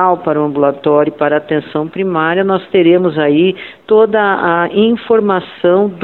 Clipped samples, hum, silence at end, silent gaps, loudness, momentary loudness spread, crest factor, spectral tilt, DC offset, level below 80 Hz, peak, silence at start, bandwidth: under 0.1%; none; 0 s; none; -12 LUFS; 6 LU; 12 dB; -9.5 dB/octave; 0.1%; -54 dBFS; 0 dBFS; 0 s; 4.3 kHz